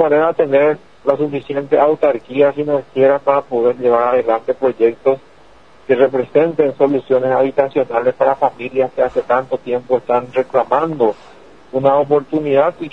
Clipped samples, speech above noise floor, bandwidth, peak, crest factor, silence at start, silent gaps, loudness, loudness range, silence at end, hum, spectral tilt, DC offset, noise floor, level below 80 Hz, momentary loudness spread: under 0.1%; 32 dB; 5.8 kHz; 0 dBFS; 16 dB; 0 s; none; -16 LUFS; 2 LU; 0.05 s; none; -8 dB/octave; 0.5%; -46 dBFS; -56 dBFS; 5 LU